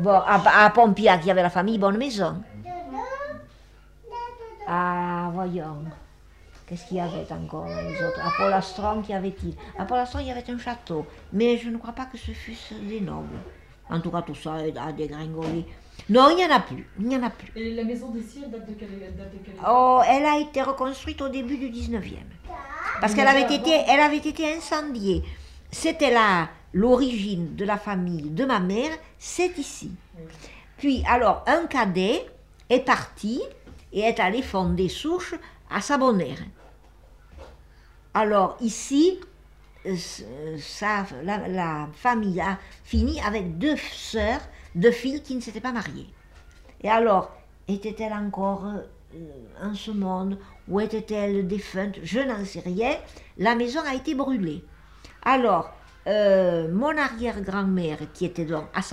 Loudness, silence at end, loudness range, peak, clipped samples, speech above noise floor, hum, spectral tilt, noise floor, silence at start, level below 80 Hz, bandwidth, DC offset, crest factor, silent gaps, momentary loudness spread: -24 LUFS; 0 s; 8 LU; -4 dBFS; under 0.1%; 27 dB; none; -5.5 dB/octave; -51 dBFS; 0 s; -44 dBFS; 14 kHz; under 0.1%; 20 dB; none; 18 LU